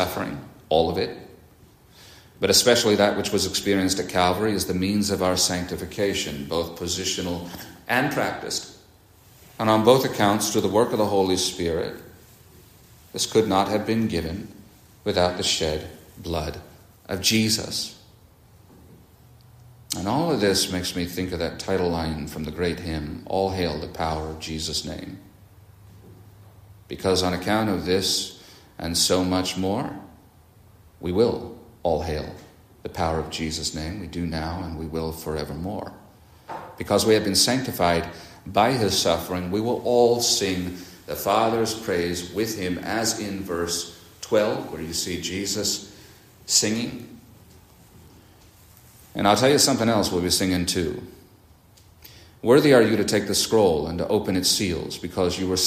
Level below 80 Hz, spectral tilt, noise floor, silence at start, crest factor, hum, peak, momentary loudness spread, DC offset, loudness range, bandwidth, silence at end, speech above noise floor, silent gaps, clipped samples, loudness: -50 dBFS; -3.5 dB/octave; -53 dBFS; 0 s; 22 dB; none; -4 dBFS; 15 LU; under 0.1%; 7 LU; 15.5 kHz; 0 s; 30 dB; none; under 0.1%; -23 LUFS